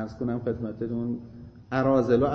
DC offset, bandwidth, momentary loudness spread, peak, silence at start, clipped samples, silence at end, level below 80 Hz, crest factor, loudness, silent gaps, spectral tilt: under 0.1%; 6.8 kHz; 16 LU; -10 dBFS; 0 s; under 0.1%; 0 s; -52 dBFS; 18 dB; -27 LUFS; none; -9 dB/octave